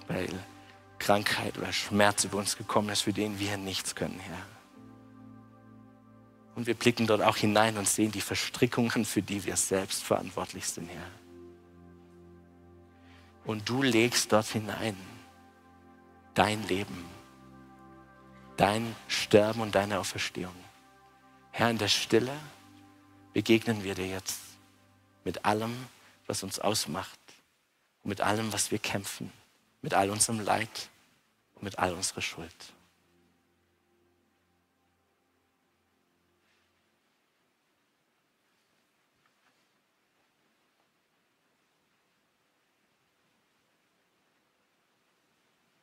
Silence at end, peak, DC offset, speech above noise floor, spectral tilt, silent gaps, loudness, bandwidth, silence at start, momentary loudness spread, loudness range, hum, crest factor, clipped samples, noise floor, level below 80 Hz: 13.15 s; -6 dBFS; under 0.1%; 45 dB; -3.5 dB/octave; none; -29 LUFS; 16 kHz; 0 s; 18 LU; 9 LU; none; 28 dB; under 0.1%; -74 dBFS; -66 dBFS